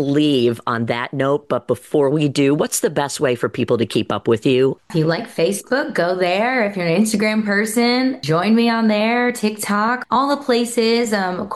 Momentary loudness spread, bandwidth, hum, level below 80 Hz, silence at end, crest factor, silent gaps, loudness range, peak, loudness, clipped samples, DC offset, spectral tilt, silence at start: 4 LU; 12.5 kHz; none; -60 dBFS; 0 s; 12 dB; none; 2 LU; -6 dBFS; -18 LUFS; under 0.1%; under 0.1%; -5 dB/octave; 0 s